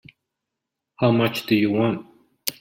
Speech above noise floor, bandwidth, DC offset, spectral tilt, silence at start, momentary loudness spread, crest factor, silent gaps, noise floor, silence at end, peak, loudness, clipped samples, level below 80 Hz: 63 dB; 16.5 kHz; under 0.1%; -6 dB/octave; 1 s; 11 LU; 22 dB; none; -83 dBFS; 0.1 s; 0 dBFS; -22 LUFS; under 0.1%; -62 dBFS